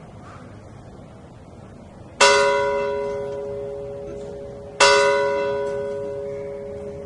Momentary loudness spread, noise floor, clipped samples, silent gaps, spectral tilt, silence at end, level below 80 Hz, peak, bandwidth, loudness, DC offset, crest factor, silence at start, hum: 27 LU; -42 dBFS; under 0.1%; none; -2 dB/octave; 0 s; -50 dBFS; -2 dBFS; 11.5 kHz; -20 LUFS; under 0.1%; 22 dB; 0 s; none